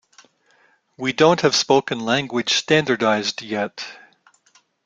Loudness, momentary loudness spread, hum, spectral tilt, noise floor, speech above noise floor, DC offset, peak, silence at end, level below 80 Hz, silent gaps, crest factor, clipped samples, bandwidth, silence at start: -19 LUFS; 11 LU; none; -3.5 dB/octave; -59 dBFS; 40 dB; under 0.1%; -2 dBFS; 0.9 s; -62 dBFS; none; 20 dB; under 0.1%; 9.4 kHz; 1 s